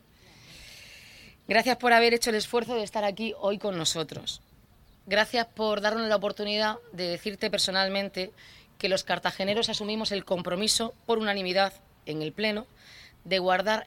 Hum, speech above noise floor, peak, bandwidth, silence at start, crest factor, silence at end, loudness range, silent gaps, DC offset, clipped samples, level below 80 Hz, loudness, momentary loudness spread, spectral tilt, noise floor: none; 30 dB; -8 dBFS; 17 kHz; 0.45 s; 22 dB; 0 s; 3 LU; none; under 0.1%; under 0.1%; -60 dBFS; -27 LUFS; 14 LU; -3 dB/octave; -58 dBFS